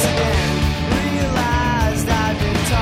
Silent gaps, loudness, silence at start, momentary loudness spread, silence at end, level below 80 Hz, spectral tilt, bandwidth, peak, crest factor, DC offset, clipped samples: none; -18 LUFS; 0 s; 2 LU; 0 s; -26 dBFS; -5 dB/octave; 16 kHz; -4 dBFS; 14 dB; under 0.1%; under 0.1%